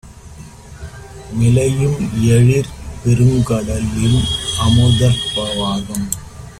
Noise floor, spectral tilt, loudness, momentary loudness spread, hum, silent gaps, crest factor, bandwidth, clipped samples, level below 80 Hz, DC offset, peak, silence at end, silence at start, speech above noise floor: -36 dBFS; -5.5 dB/octave; -15 LUFS; 15 LU; none; none; 14 dB; 14.5 kHz; under 0.1%; -32 dBFS; under 0.1%; 0 dBFS; 0.05 s; 0.05 s; 22 dB